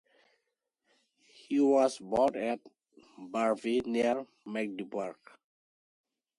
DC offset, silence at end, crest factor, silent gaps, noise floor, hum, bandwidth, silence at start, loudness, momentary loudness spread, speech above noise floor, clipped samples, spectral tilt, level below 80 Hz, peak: under 0.1%; 1.25 s; 18 dB; none; -83 dBFS; none; 11.5 kHz; 1.5 s; -31 LUFS; 13 LU; 53 dB; under 0.1%; -5 dB/octave; -72 dBFS; -14 dBFS